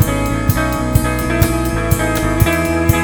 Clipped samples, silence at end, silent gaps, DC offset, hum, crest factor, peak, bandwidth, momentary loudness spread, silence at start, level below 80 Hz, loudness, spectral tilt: 0.2%; 0 s; none; under 0.1%; none; 14 dB; 0 dBFS; over 20 kHz; 2 LU; 0 s; -22 dBFS; -16 LUFS; -5.5 dB/octave